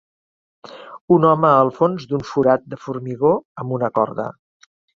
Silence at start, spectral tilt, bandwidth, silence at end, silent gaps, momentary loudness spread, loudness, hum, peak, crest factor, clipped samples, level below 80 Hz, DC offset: 0.65 s; -8.5 dB/octave; 7.2 kHz; 0.65 s; 1.01-1.08 s, 3.45-3.55 s; 16 LU; -18 LUFS; none; 0 dBFS; 18 dB; under 0.1%; -58 dBFS; under 0.1%